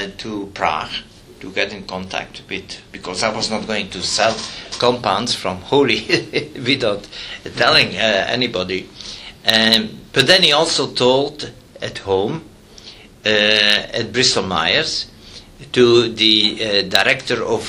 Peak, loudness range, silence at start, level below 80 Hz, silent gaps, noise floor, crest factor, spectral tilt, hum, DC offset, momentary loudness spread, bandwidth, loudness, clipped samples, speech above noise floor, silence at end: 0 dBFS; 7 LU; 0 s; -48 dBFS; none; -40 dBFS; 18 dB; -3 dB/octave; none; under 0.1%; 16 LU; 17 kHz; -16 LUFS; under 0.1%; 23 dB; 0 s